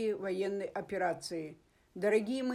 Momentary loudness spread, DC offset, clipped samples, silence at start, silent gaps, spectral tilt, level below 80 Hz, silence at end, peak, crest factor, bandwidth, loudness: 11 LU; under 0.1%; under 0.1%; 0 s; none; -5 dB/octave; -72 dBFS; 0 s; -18 dBFS; 16 dB; 14.5 kHz; -35 LUFS